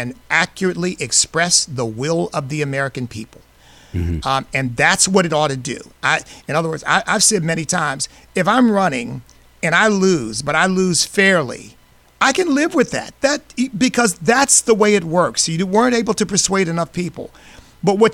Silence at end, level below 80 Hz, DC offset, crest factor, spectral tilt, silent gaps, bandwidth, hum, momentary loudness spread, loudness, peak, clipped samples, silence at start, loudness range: 0 s; -44 dBFS; under 0.1%; 16 dB; -3.5 dB/octave; none; 16.5 kHz; none; 11 LU; -16 LUFS; -2 dBFS; under 0.1%; 0 s; 4 LU